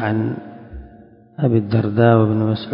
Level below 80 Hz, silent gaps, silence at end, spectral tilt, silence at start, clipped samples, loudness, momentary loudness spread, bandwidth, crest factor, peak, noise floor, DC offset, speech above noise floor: -44 dBFS; none; 0 s; -12.5 dB/octave; 0 s; under 0.1%; -17 LUFS; 23 LU; 5.4 kHz; 18 dB; 0 dBFS; -45 dBFS; under 0.1%; 29 dB